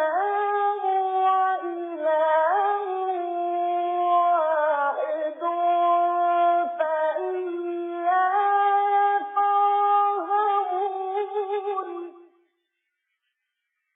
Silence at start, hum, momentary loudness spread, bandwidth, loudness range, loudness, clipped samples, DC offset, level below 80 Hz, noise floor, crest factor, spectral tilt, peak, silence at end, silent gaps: 0 s; none; 8 LU; 3.8 kHz; 4 LU; -23 LUFS; under 0.1%; under 0.1%; under -90 dBFS; -80 dBFS; 12 dB; -3.5 dB/octave; -10 dBFS; 1.75 s; none